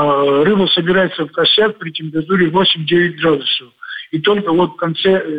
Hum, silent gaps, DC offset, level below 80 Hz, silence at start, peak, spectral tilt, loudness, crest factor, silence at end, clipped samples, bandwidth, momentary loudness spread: none; none; under 0.1%; -52 dBFS; 0 s; -2 dBFS; -7.5 dB/octave; -14 LUFS; 12 dB; 0 s; under 0.1%; 5 kHz; 9 LU